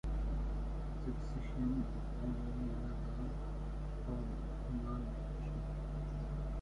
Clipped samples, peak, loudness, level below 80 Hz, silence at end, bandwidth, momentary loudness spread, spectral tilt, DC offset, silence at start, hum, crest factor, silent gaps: under 0.1%; -26 dBFS; -42 LUFS; -42 dBFS; 0 s; 7 kHz; 4 LU; -8.5 dB/octave; under 0.1%; 0.05 s; none; 12 dB; none